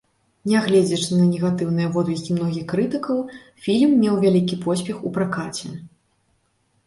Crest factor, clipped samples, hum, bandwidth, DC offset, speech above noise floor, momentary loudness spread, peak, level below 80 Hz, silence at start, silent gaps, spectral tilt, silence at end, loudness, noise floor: 14 dB; under 0.1%; none; 11.5 kHz; under 0.1%; 46 dB; 13 LU; -6 dBFS; -58 dBFS; 0.45 s; none; -6.5 dB/octave; 1 s; -21 LUFS; -66 dBFS